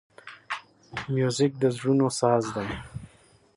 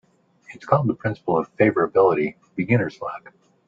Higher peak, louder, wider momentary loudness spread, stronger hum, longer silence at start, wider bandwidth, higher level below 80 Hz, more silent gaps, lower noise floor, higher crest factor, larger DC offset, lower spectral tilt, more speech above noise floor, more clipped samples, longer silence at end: second, -8 dBFS vs -2 dBFS; second, -26 LUFS vs -21 LUFS; first, 19 LU vs 15 LU; neither; second, 0.25 s vs 0.5 s; first, 11.5 kHz vs 7.4 kHz; about the same, -56 dBFS vs -60 dBFS; neither; first, -58 dBFS vs -49 dBFS; about the same, 20 dB vs 20 dB; neither; second, -5.5 dB/octave vs -9 dB/octave; first, 33 dB vs 28 dB; neither; about the same, 0.5 s vs 0.5 s